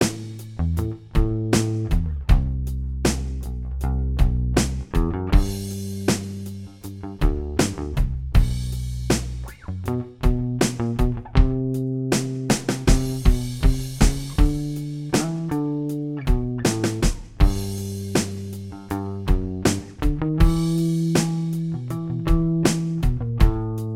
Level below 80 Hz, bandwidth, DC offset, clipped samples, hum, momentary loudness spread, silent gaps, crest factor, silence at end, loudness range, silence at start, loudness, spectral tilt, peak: -24 dBFS; 16 kHz; under 0.1%; under 0.1%; none; 9 LU; none; 20 dB; 0 s; 3 LU; 0 s; -24 LUFS; -6 dB/octave; 0 dBFS